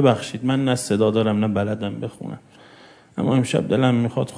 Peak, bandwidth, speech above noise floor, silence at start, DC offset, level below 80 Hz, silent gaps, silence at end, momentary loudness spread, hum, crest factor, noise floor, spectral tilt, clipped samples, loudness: -2 dBFS; 11 kHz; 28 dB; 0 s; under 0.1%; -60 dBFS; none; 0 s; 14 LU; none; 18 dB; -48 dBFS; -6.5 dB/octave; under 0.1%; -21 LUFS